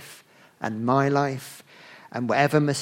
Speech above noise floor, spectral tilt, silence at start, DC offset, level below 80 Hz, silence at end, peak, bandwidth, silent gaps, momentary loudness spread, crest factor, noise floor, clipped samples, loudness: 28 dB; -6 dB/octave; 0 s; under 0.1%; -66 dBFS; 0 s; -4 dBFS; 16.5 kHz; none; 21 LU; 20 dB; -51 dBFS; under 0.1%; -24 LUFS